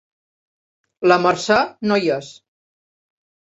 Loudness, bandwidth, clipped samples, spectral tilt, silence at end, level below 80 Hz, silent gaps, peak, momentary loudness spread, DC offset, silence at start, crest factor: -18 LUFS; 8 kHz; under 0.1%; -4.5 dB/octave; 1.15 s; -60 dBFS; none; -2 dBFS; 7 LU; under 0.1%; 1 s; 20 dB